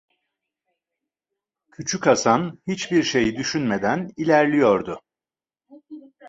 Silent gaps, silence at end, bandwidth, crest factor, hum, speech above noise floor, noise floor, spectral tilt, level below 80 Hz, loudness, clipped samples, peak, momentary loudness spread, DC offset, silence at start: none; 0 s; 8.2 kHz; 22 dB; none; over 70 dB; under -90 dBFS; -4.5 dB/octave; -58 dBFS; -21 LUFS; under 0.1%; -2 dBFS; 11 LU; under 0.1%; 1.8 s